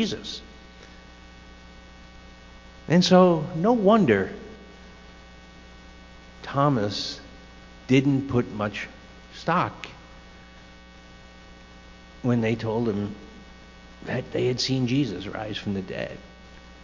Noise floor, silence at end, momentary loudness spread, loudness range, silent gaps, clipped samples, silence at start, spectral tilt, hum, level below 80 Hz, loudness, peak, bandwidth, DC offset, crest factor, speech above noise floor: -47 dBFS; 0 s; 28 LU; 9 LU; none; under 0.1%; 0 s; -6 dB/octave; none; -50 dBFS; -24 LUFS; -4 dBFS; 7.6 kHz; under 0.1%; 22 dB; 24 dB